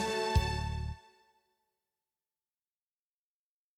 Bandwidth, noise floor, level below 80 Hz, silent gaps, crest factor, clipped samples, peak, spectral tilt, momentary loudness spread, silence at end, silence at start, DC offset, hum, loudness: 16 kHz; under -90 dBFS; -42 dBFS; none; 22 dB; under 0.1%; -16 dBFS; -5 dB/octave; 13 LU; 2.8 s; 0 s; under 0.1%; none; -34 LUFS